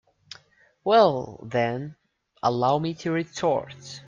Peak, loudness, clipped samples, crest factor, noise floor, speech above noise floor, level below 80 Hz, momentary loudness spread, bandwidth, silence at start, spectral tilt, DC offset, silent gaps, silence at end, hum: -6 dBFS; -24 LUFS; under 0.1%; 20 dB; -60 dBFS; 36 dB; -64 dBFS; 25 LU; 7.6 kHz; 0.85 s; -6 dB/octave; under 0.1%; none; 0.1 s; none